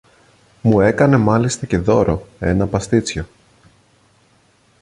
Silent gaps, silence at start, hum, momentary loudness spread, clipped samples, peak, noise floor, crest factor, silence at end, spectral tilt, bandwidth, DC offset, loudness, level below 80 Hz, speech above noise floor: none; 0.65 s; none; 9 LU; under 0.1%; -2 dBFS; -56 dBFS; 16 dB; 1.55 s; -6.5 dB/octave; 11.5 kHz; under 0.1%; -17 LUFS; -36 dBFS; 40 dB